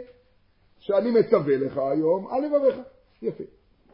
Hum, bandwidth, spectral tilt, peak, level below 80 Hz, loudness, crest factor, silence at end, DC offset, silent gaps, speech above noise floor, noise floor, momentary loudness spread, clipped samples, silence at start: none; 5.6 kHz; -11.5 dB/octave; -6 dBFS; -64 dBFS; -24 LUFS; 20 dB; 0.45 s; under 0.1%; none; 38 dB; -61 dBFS; 18 LU; under 0.1%; 0 s